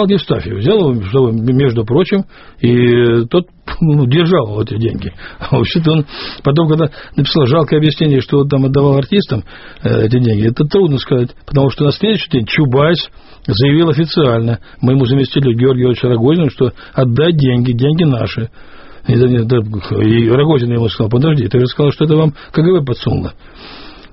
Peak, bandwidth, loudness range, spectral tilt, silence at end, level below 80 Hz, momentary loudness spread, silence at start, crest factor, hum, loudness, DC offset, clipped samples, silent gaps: 0 dBFS; 5.8 kHz; 2 LU; -6.5 dB/octave; 0.2 s; -38 dBFS; 8 LU; 0 s; 12 dB; none; -13 LUFS; under 0.1%; under 0.1%; none